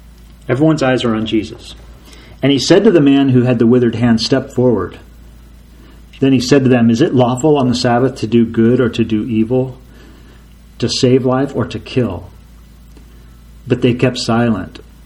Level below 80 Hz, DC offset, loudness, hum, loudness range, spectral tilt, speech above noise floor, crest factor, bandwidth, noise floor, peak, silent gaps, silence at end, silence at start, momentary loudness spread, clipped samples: -40 dBFS; under 0.1%; -13 LUFS; none; 6 LU; -6.5 dB/octave; 27 dB; 14 dB; 12 kHz; -40 dBFS; 0 dBFS; none; 0.35 s; 0.5 s; 11 LU; under 0.1%